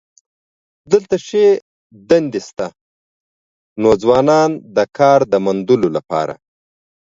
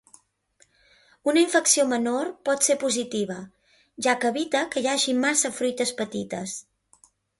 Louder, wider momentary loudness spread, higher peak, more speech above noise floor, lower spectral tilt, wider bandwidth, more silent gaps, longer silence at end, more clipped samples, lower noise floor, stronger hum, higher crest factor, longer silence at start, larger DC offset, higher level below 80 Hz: first, -15 LUFS vs -24 LUFS; about the same, 12 LU vs 12 LU; first, 0 dBFS vs -6 dBFS; first, over 76 dB vs 40 dB; first, -6 dB/octave vs -2 dB/octave; second, 7.8 kHz vs 12 kHz; first, 1.62-1.90 s, 2.81-3.76 s vs none; about the same, 0.85 s vs 0.8 s; neither; first, under -90 dBFS vs -64 dBFS; neither; about the same, 16 dB vs 20 dB; second, 0.9 s vs 1.25 s; neither; first, -54 dBFS vs -70 dBFS